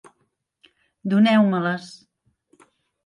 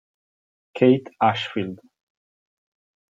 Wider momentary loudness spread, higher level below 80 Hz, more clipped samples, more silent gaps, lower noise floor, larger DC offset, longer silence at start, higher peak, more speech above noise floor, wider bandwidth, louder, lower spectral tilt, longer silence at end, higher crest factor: first, 17 LU vs 14 LU; about the same, -74 dBFS vs -72 dBFS; neither; neither; second, -72 dBFS vs under -90 dBFS; neither; first, 1.05 s vs 0.75 s; second, -8 dBFS vs -4 dBFS; second, 53 dB vs over 69 dB; first, 10 kHz vs 7.6 kHz; about the same, -20 LUFS vs -21 LUFS; about the same, -7 dB/octave vs -7.5 dB/octave; second, 1.15 s vs 1.35 s; about the same, 16 dB vs 20 dB